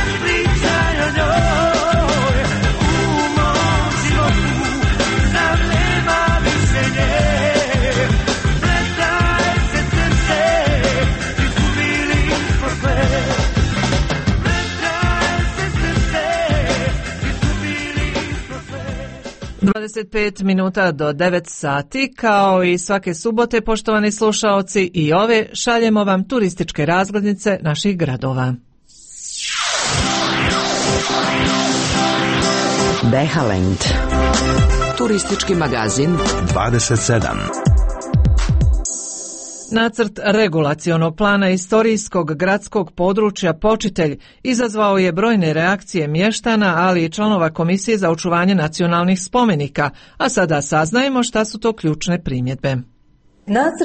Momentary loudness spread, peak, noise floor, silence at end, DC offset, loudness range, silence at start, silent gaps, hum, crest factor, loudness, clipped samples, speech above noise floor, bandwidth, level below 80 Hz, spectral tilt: 6 LU; -4 dBFS; -52 dBFS; 0 s; under 0.1%; 3 LU; 0 s; none; none; 14 dB; -17 LUFS; under 0.1%; 36 dB; 8.8 kHz; -26 dBFS; -5 dB/octave